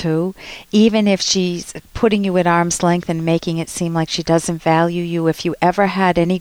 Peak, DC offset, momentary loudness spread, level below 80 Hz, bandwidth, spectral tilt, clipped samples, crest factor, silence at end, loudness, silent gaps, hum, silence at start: -2 dBFS; under 0.1%; 7 LU; -44 dBFS; 16 kHz; -5 dB/octave; under 0.1%; 14 dB; 0 s; -17 LUFS; none; none; 0 s